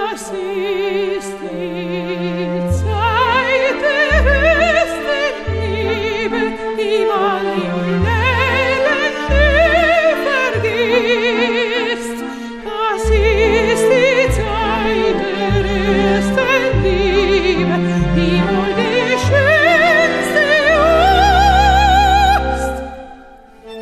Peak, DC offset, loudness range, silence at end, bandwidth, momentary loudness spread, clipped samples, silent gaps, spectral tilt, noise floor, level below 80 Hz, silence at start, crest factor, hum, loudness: 0 dBFS; under 0.1%; 5 LU; 0 s; 14 kHz; 10 LU; under 0.1%; none; -5.5 dB/octave; -40 dBFS; -26 dBFS; 0 s; 14 dB; none; -14 LUFS